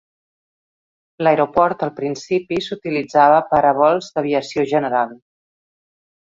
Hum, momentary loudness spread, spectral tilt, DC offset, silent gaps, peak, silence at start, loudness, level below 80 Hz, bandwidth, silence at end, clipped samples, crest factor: none; 10 LU; -6 dB/octave; under 0.1%; none; -2 dBFS; 1.2 s; -18 LUFS; -58 dBFS; 7.8 kHz; 1.05 s; under 0.1%; 18 dB